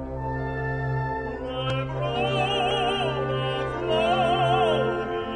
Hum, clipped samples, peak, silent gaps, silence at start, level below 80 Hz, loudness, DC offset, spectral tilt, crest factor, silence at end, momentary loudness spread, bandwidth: none; under 0.1%; -12 dBFS; none; 0 s; -42 dBFS; -25 LUFS; under 0.1%; -6 dB/octave; 14 dB; 0 s; 8 LU; 9.8 kHz